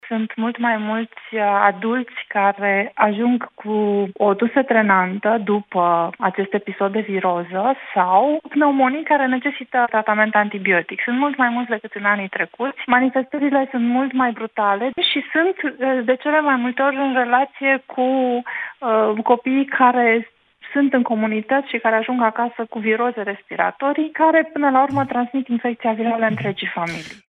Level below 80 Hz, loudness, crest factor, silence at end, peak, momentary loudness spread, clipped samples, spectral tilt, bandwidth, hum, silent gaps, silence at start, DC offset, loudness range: -72 dBFS; -19 LUFS; 18 dB; 0.1 s; 0 dBFS; 7 LU; under 0.1%; -7 dB/octave; 6.6 kHz; none; none; 0.05 s; under 0.1%; 2 LU